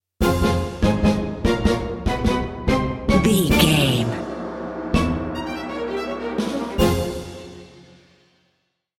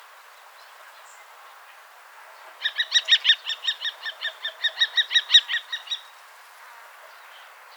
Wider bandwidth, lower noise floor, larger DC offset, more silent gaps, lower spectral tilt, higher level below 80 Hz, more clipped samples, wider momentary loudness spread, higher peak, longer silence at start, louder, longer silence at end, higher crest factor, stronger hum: second, 16.5 kHz vs over 20 kHz; first, -70 dBFS vs -48 dBFS; neither; neither; first, -5.5 dB/octave vs 8 dB/octave; first, -32 dBFS vs under -90 dBFS; neither; about the same, 12 LU vs 14 LU; about the same, -2 dBFS vs -4 dBFS; second, 0.2 s vs 0.85 s; about the same, -21 LUFS vs -21 LUFS; first, 1.2 s vs 0.35 s; about the same, 20 dB vs 24 dB; neither